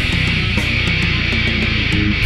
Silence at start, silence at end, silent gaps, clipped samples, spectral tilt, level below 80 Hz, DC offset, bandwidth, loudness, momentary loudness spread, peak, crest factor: 0 s; 0 s; none; under 0.1%; -5 dB/octave; -24 dBFS; under 0.1%; 13.5 kHz; -16 LUFS; 1 LU; -4 dBFS; 12 dB